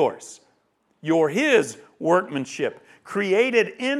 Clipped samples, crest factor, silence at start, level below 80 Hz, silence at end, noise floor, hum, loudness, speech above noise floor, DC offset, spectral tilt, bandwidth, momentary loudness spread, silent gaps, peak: under 0.1%; 18 dB; 0 s; -78 dBFS; 0 s; -67 dBFS; none; -22 LUFS; 45 dB; under 0.1%; -4.5 dB/octave; 12.5 kHz; 13 LU; none; -4 dBFS